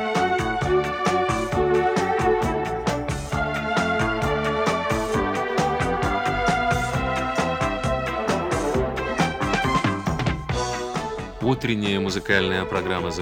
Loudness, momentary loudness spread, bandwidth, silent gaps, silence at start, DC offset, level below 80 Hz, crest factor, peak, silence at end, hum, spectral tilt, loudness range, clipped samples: -23 LUFS; 5 LU; 17 kHz; none; 0 s; under 0.1%; -38 dBFS; 18 dB; -6 dBFS; 0 s; none; -5.5 dB/octave; 1 LU; under 0.1%